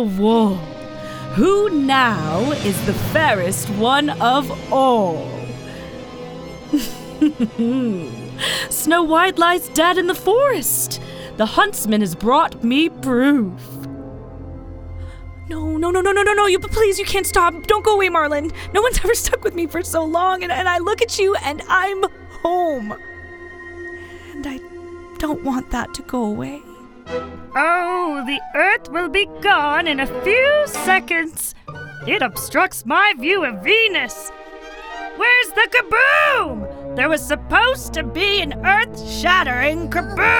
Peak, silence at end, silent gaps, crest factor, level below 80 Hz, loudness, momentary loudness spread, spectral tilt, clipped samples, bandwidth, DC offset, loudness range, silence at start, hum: -2 dBFS; 0 s; none; 18 dB; -38 dBFS; -17 LUFS; 18 LU; -3.5 dB/octave; under 0.1%; over 20 kHz; under 0.1%; 7 LU; 0 s; none